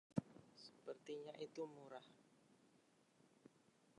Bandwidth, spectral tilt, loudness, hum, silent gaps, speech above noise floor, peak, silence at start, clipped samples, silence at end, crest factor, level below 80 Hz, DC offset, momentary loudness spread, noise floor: 11 kHz; -6.5 dB/octave; -54 LUFS; none; none; 23 dB; -26 dBFS; 0.1 s; under 0.1%; 0.05 s; 30 dB; -84 dBFS; under 0.1%; 14 LU; -76 dBFS